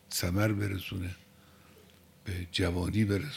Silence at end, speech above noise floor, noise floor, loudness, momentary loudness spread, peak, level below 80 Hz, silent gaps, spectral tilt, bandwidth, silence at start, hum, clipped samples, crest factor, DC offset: 0 s; 27 dB; -58 dBFS; -32 LUFS; 12 LU; -14 dBFS; -52 dBFS; none; -5.5 dB/octave; 16.5 kHz; 0.1 s; none; under 0.1%; 18 dB; under 0.1%